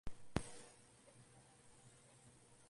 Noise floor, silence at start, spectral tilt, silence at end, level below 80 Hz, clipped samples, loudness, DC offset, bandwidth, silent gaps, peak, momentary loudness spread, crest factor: -66 dBFS; 0.05 s; -5 dB/octave; 0 s; -62 dBFS; under 0.1%; -50 LUFS; under 0.1%; 11.5 kHz; none; -20 dBFS; 18 LU; 32 dB